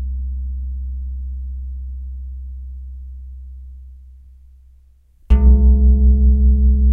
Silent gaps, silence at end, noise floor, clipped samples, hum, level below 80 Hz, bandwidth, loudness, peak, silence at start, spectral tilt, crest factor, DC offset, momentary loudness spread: none; 0 s; -49 dBFS; under 0.1%; none; -16 dBFS; 1.2 kHz; -17 LUFS; -2 dBFS; 0 s; -11.5 dB/octave; 14 dB; under 0.1%; 23 LU